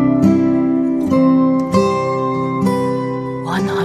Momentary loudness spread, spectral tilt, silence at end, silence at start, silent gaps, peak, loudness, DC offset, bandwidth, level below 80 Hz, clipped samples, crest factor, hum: 7 LU; -7.5 dB/octave; 0 s; 0 s; none; -2 dBFS; -16 LUFS; under 0.1%; 12 kHz; -46 dBFS; under 0.1%; 14 dB; none